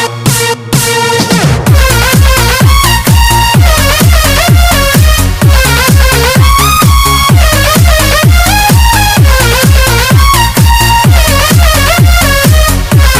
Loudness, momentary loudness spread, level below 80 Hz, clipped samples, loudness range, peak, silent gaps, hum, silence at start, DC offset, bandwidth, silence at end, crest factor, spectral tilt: -6 LUFS; 2 LU; -10 dBFS; 5%; 1 LU; 0 dBFS; none; none; 0 s; under 0.1%; 16 kHz; 0 s; 6 dB; -4 dB/octave